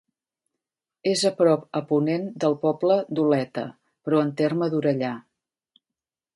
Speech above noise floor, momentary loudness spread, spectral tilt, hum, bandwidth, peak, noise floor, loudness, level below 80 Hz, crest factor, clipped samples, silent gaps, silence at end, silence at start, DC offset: 66 dB; 10 LU; -6 dB/octave; none; 11.5 kHz; -6 dBFS; -89 dBFS; -24 LUFS; -74 dBFS; 18 dB; under 0.1%; none; 1.15 s; 1.05 s; under 0.1%